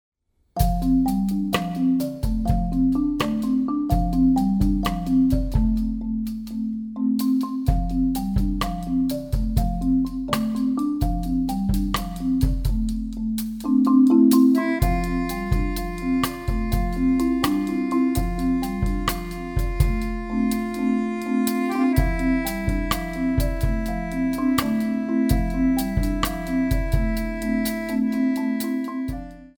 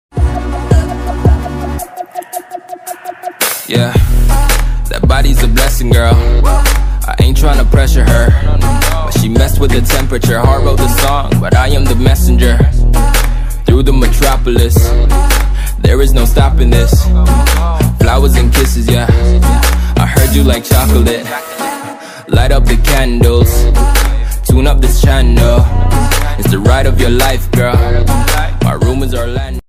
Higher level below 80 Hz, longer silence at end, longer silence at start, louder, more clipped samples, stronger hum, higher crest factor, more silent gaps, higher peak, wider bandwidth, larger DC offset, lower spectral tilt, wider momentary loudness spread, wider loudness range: second, -28 dBFS vs -10 dBFS; about the same, 0.1 s vs 0.1 s; first, 0.55 s vs 0.15 s; second, -23 LUFS vs -11 LUFS; second, under 0.1% vs 0.8%; neither; first, 18 dB vs 8 dB; neither; second, -4 dBFS vs 0 dBFS; first, over 20 kHz vs 16.5 kHz; neither; about the same, -6.5 dB/octave vs -5.5 dB/octave; about the same, 7 LU vs 8 LU; about the same, 4 LU vs 3 LU